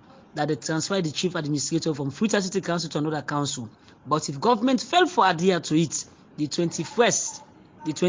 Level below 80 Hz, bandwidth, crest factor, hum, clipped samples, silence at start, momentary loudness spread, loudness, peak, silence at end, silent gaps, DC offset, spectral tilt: -64 dBFS; 7.8 kHz; 18 dB; none; under 0.1%; 0.35 s; 11 LU; -25 LUFS; -6 dBFS; 0 s; none; under 0.1%; -4 dB/octave